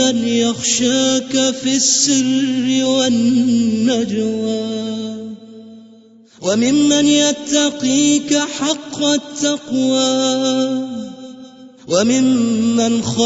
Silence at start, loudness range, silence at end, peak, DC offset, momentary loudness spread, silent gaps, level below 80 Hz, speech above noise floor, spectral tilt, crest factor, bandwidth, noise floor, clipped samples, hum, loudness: 0 s; 4 LU; 0 s; -2 dBFS; under 0.1%; 10 LU; none; -60 dBFS; 29 dB; -3 dB/octave; 14 dB; 8 kHz; -45 dBFS; under 0.1%; none; -15 LUFS